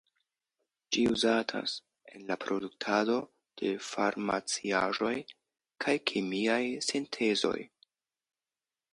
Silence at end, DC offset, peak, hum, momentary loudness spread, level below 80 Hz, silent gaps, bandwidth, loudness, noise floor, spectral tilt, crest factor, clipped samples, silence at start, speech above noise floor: 1.25 s; under 0.1%; -10 dBFS; none; 9 LU; -70 dBFS; none; 11.5 kHz; -31 LUFS; under -90 dBFS; -3.5 dB/octave; 22 dB; under 0.1%; 0.9 s; over 59 dB